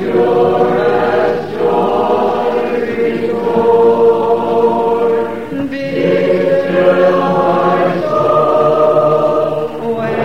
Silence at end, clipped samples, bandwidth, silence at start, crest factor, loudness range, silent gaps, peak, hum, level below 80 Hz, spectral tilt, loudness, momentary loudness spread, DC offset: 0 s; under 0.1%; 8.2 kHz; 0 s; 12 dB; 2 LU; none; 0 dBFS; none; -46 dBFS; -7.5 dB/octave; -13 LUFS; 7 LU; 1%